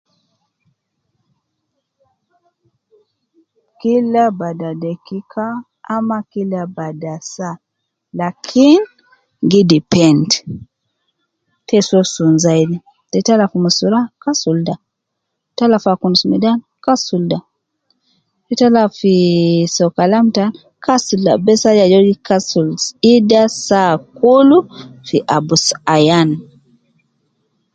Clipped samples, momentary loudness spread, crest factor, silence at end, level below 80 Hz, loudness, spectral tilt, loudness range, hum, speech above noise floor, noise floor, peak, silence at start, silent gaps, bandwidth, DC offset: under 0.1%; 15 LU; 14 dB; 1.3 s; -56 dBFS; -14 LUFS; -5 dB/octave; 8 LU; none; 62 dB; -75 dBFS; 0 dBFS; 3.85 s; none; 9.2 kHz; under 0.1%